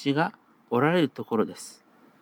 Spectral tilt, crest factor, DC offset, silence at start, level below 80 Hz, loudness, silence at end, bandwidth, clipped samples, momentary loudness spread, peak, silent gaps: -6 dB/octave; 20 dB; under 0.1%; 0 s; -84 dBFS; -26 LUFS; 0.5 s; 19 kHz; under 0.1%; 14 LU; -8 dBFS; none